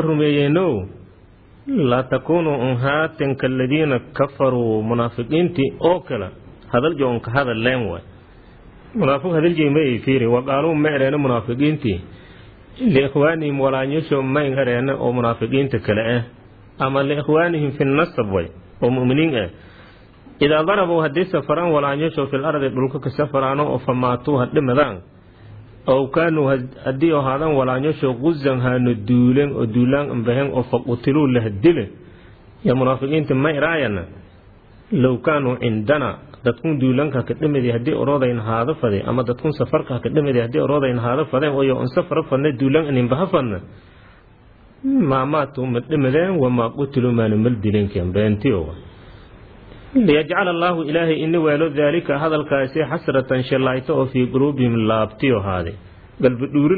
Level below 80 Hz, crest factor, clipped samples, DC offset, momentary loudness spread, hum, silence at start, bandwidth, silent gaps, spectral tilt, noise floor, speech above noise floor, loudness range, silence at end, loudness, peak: -46 dBFS; 16 dB; under 0.1%; under 0.1%; 6 LU; none; 0 s; 4.9 kHz; none; -11 dB/octave; -48 dBFS; 30 dB; 2 LU; 0 s; -19 LUFS; -2 dBFS